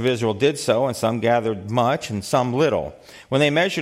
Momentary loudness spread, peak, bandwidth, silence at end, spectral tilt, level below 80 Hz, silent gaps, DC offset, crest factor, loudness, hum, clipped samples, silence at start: 6 LU; -4 dBFS; 16 kHz; 0 s; -5 dB/octave; -56 dBFS; none; under 0.1%; 16 dB; -21 LUFS; none; under 0.1%; 0 s